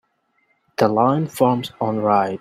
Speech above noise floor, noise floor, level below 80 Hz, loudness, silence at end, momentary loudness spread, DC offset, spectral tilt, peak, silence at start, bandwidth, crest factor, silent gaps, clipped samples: 47 dB; -66 dBFS; -62 dBFS; -19 LUFS; 0.05 s; 6 LU; under 0.1%; -7 dB/octave; -2 dBFS; 0.8 s; 16 kHz; 18 dB; none; under 0.1%